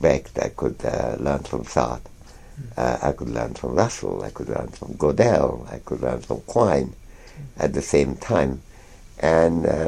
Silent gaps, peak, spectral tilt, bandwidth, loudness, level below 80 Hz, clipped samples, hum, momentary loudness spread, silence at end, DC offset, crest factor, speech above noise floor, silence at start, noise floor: none; -2 dBFS; -6 dB/octave; 13 kHz; -23 LUFS; -40 dBFS; under 0.1%; none; 14 LU; 0 s; under 0.1%; 22 dB; 22 dB; 0 s; -44 dBFS